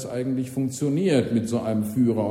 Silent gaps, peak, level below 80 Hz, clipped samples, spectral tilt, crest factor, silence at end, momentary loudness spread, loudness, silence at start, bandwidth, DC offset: none; -8 dBFS; -60 dBFS; under 0.1%; -7 dB/octave; 16 dB; 0 s; 6 LU; -24 LUFS; 0 s; 16 kHz; under 0.1%